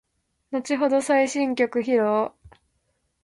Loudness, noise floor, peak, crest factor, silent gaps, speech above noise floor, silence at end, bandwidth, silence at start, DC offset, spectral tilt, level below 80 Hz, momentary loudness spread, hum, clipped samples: -23 LUFS; -72 dBFS; -8 dBFS; 16 dB; none; 50 dB; 0.75 s; 11.5 kHz; 0.5 s; under 0.1%; -4 dB/octave; -64 dBFS; 11 LU; none; under 0.1%